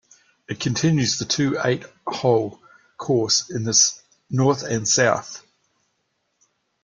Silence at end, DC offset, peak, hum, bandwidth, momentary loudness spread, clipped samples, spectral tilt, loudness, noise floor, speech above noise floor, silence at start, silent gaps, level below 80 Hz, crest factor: 1.45 s; under 0.1%; -4 dBFS; none; 10.5 kHz; 15 LU; under 0.1%; -3.5 dB/octave; -20 LUFS; -72 dBFS; 51 dB; 0.5 s; none; -58 dBFS; 20 dB